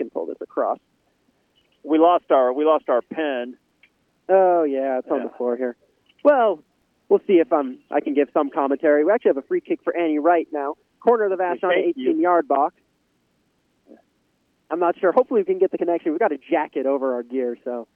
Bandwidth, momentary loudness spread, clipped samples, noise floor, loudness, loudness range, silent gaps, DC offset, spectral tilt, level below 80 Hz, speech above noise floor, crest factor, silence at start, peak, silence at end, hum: 3.6 kHz; 10 LU; under 0.1%; -67 dBFS; -21 LUFS; 4 LU; none; under 0.1%; -8 dB/octave; -76 dBFS; 47 dB; 18 dB; 0 s; -4 dBFS; 0.1 s; none